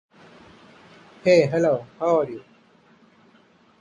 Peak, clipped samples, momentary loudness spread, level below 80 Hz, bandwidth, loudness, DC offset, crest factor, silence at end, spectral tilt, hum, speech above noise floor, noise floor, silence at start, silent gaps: -4 dBFS; under 0.1%; 12 LU; -64 dBFS; 10 kHz; -21 LUFS; under 0.1%; 20 dB; 1.45 s; -6.5 dB/octave; none; 37 dB; -57 dBFS; 1.25 s; none